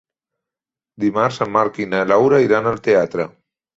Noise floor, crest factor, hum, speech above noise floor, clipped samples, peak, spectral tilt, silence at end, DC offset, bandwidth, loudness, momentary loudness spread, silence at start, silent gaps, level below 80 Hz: -88 dBFS; 18 dB; none; 72 dB; under 0.1%; -2 dBFS; -6.5 dB/octave; 0.5 s; under 0.1%; 7.8 kHz; -17 LUFS; 9 LU; 1 s; none; -58 dBFS